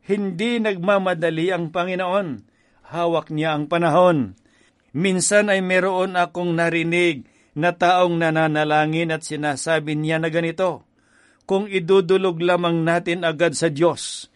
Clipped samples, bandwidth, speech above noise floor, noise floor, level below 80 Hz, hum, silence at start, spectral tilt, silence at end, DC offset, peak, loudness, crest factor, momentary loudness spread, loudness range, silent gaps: under 0.1%; 11.5 kHz; 39 dB; -58 dBFS; -64 dBFS; none; 0.1 s; -5 dB/octave; 0.1 s; under 0.1%; -4 dBFS; -20 LUFS; 16 dB; 7 LU; 3 LU; none